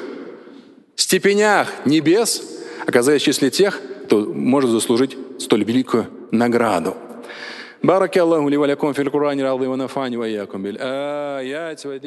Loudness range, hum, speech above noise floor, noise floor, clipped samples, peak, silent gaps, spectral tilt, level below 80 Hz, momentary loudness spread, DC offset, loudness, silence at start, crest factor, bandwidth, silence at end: 3 LU; none; 26 dB; -44 dBFS; under 0.1%; 0 dBFS; none; -4 dB/octave; -66 dBFS; 15 LU; under 0.1%; -18 LUFS; 0 s; 18 dB; 12.5 kHz; 0 s